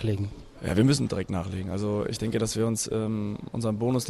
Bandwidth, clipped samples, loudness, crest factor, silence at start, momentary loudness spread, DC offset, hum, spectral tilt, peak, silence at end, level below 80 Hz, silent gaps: 14 kHz; under 0.1%; -28 LUFS; 18 dB; 0 s; 9 LU; under 0.1%; none; -5.5 dB/octave; -10 dBFS; 0 s; -50 dBFS; none